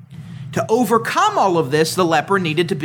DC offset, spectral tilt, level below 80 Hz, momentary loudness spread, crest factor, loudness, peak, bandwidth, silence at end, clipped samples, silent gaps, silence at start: under 0.1%; -5 dB/octave; -62 dBFS; 10 LU; 16 dB; -17 LUFS; -2 dBFS; 20 kHz; 0 s; under 0.1%; none; 0 s